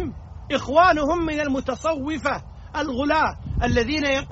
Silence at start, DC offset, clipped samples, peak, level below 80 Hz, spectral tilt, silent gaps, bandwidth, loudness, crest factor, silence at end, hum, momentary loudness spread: 0 s; under 0.1%; under 0.1%; -4 dBFS; -36 dBFS; -3.5 dB/octave; none; 8 kHz; -22 LUFS; 18 dB; 0 s; none; 12 LU